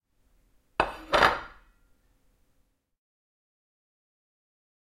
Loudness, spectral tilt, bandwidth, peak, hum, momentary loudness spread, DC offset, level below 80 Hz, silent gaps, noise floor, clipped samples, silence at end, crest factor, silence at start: -26 LUFS; -3.5 dB/octave; 16 kHz; -4 dBFS; none; 13 LU; under 0.1%; -52 dBFS; none; -70 dBFS; under 0.1%; 3.55 s; 28 dB; 0.8 s